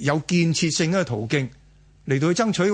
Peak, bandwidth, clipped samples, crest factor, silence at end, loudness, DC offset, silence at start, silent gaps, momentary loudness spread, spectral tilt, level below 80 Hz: -6 dBFS; 10 kHz; under 0.1%; 16 dB; 0 s; -22 LUFS; under 0.1%; 0 s; none; 6 LU; -5 dB/octave; -54 dBFS